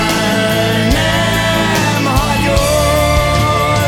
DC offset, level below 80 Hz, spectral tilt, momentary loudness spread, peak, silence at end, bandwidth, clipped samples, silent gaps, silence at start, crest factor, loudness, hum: under 0.1%; -22 dBFS; -4.5 dB/octave; 1 LU; 0 dBFS; 0 s; 18 kHz; under 0.1%; none; 0 s; 12 dB; -12 LUFS; none